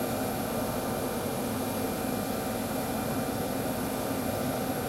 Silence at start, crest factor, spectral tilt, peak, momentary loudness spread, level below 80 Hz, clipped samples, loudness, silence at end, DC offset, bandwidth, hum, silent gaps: 0 s; 12 dB; -5 dB/octave; -18 dBFS; 1 LU; -50 dBFS; under 0.1%; -31 LUFS; 0 s; under 0.1%; 16 kHz; none; none